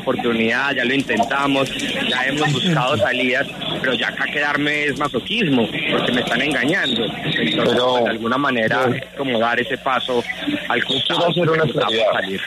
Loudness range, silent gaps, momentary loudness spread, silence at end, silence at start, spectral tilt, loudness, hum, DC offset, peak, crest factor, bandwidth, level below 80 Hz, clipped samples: 1 LU; none; 4 LU; 0 s; 0 s; -4.5 dB/octave; -18 LUFS; none; under 0.1%; -6 dBFS; 14 dB; 13.5 kHz; -52 dBFS; under 0.1%